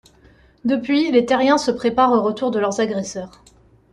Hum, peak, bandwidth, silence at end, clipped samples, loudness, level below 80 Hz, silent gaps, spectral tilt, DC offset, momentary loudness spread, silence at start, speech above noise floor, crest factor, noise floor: none; -4 dBFS; 11 kHz; 0.65 s; under 0.1%; -19 LUFS; -56 dBFS; none; -4.5 dB/octave; under 0.1%; 11 LU; 0.65 s; 33 dB; 16 dB; -51 dBFS